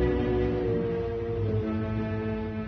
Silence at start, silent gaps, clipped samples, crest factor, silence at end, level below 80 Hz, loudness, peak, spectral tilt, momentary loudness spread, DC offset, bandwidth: 0 s; none; under 0.1%; 14 dB; 0 s; -38 dBFS; -29 LUFS; -14 dBFS; -10 dB/octave; 4 LU; under 0.1%; 6.2 kHz